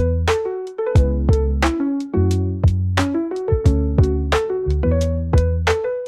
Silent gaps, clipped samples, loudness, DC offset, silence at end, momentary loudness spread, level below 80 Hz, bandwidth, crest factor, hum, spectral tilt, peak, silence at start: none; under 0.1%; -19 LUFS; 0.1%; 0 s; 4 LU; -24 dBFS; 11.5 kHz; 14 dB; none; -7 dB/octave; -4 dBFS; 0 s